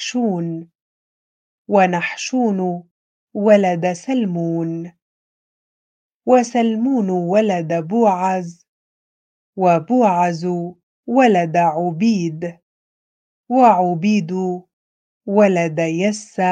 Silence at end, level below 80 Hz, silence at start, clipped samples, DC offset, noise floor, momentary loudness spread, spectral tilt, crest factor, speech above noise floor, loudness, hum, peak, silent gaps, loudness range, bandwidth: 0 s; -70 dBFS; 0 s; under 0.1%; under 0.1%; under -90 dBFS; 15 LU; -6.5 dB/octave; 18 dB; over 73 dB; -17 LUFS; none; 0 dBFS; 0.75-1.65 s, 2.91-3.28 s, 5.02-6.20 s, 8.69-9.53 s, 10.83-11.03 s, 12.63-13.44 s, 14.73-15.21 s; 3 LU; 9.2 kHz